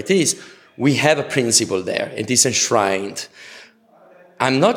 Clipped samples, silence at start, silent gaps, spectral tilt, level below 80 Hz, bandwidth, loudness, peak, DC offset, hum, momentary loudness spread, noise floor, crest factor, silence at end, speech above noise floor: under 0.1%; 0 s; none; -3 dB/octave; -64 dBFS; 18 kHz; -18 LUFS; -2 dBFS; under 0.1%; none; 13 LU; -50 dBFS; 18 dB; 0 s; 32 dB